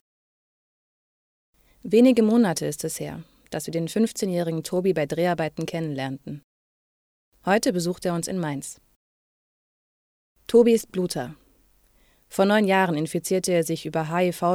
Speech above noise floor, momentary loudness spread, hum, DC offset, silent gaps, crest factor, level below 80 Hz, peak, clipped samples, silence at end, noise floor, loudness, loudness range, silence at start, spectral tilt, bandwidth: 38 dB; 16 LU; none; under 0.1%; 6.44-7.32 s, 8.96-10.35 s; 18 dB; -62 dBFS; -6 dBFS; under 0.1%; 0 s; -61 dBFS; -23 LUFS; 5 LU; 1.85 s; -5.5 dB/octave; 16.5 kHz